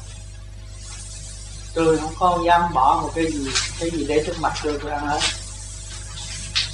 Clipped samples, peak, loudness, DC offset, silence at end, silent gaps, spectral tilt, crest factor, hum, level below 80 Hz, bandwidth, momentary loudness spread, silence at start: under 0.1%; -4 dBFS; -21 LUFS; under 0.1%; 0 s; none; -3.5 dB/octave; 20 dB; 50 Hz at -35 dBFS; -36 dBFS; 12 kHz; 18 LU; 0 s